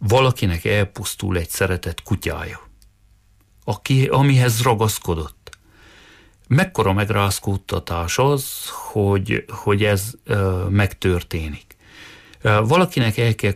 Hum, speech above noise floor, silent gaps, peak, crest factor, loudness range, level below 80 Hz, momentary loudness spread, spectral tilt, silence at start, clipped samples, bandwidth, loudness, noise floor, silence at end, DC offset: none; 36 dB; none; -6 dBFS; 14 dB; 3 LU; -40 dBFS; 11 LU; -5.5 dB/octave; 0 s; under 0.1%; 15.5 kHz; -20 LUFS; -55 dBFS; 0 s; under 0.1%